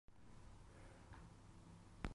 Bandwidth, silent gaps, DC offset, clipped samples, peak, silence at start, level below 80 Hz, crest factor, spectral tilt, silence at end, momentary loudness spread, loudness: 11 kHz; none; under 0.1%; under 0.1%; -26 dBFS; 0.05 s; -62 dBFS; 30 dB; -6 dB/octave; 0 s; 4 LU; -62 LUFS